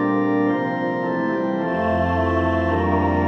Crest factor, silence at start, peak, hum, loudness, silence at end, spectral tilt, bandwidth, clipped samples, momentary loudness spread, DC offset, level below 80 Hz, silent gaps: 12 dB; 0 s; -8 dBFS; none; -21 LUFS; 0 s; -9 dB/octave; 6.6 kHz; under 0.1%; 3 LU; under 0.1%; -40 dBFS; none